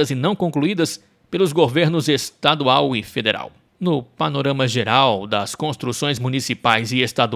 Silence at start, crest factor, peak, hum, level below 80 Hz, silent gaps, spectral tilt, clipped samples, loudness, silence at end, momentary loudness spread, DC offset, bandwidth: 0 s; 20 dB; 0 dBFS; none; -56 dBFS; none; -5 dB/octave; under 0.1%; -19 LUFS; 0 s; 8 LU; under 0.1%; 16 kHz